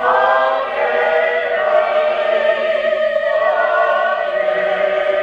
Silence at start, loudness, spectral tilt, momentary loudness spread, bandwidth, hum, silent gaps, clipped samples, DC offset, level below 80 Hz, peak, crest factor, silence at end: 0 s; -16 LUFS; -3.5 dB/octave; 3 LU; 7 kHz; none; none; under 0.1%; under 0.1%; -58 dBFS; 0 dBFS; 14 dB; 0 s